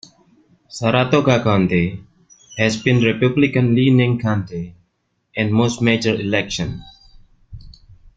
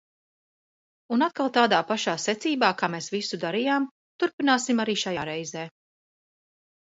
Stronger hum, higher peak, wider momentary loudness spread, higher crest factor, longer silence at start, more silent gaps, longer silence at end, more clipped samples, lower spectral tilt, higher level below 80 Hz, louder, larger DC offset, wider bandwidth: neither; first, 0 dBFS vs -6 dBFS; first, 15 LU vs 10 LU; about the same, 18 dB vs 22 dB; second, 0.7 s vs 1.1 s; second, none vs 3.91-4.19 s, 4.33-4.38 s; second, 0.45 s vs 1.15 s; neither; first, -6 dB/octave vs -3.5 dB/octave; first, -48 dBFS vs -72 dBFS; first, -17 LUFS vs -25 LUFS; neither; about the same, 8.8 kHz vs 8 kHz